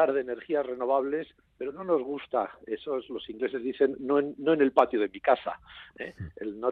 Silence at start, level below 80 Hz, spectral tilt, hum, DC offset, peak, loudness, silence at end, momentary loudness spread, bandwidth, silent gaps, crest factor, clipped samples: 0 s; -64 dBFS; -8 dB/octave; none; under 0.1%; -6 dBFS; -29 LUFS; 0 s; 15 LU; 5.4 kHz; none; 22 dB; under 0.1%